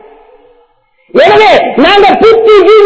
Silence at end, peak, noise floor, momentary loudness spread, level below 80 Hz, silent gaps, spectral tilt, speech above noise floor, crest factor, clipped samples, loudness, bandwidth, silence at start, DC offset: 0 s; 0 dBFS; -49 dBFS; 3 LU; -40 dBFS; none; -4.5 dB/octave; 46 dB; 6 dB; 10%; -4 LUFS; 8 kHz; 1.15 s; under 0.1%